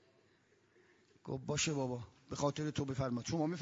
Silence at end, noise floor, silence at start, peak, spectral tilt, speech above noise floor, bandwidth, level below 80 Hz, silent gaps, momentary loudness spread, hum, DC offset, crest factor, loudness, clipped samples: 0 s; -72 dBFS; 1.25 s; -20 dBFS; -5.5 dB/octave; 34 dB; 7.4 kHz; -66 dBFS; none; 11 LU; none; under 0.1%; 20 dB; -39 LUFS; under 0.1%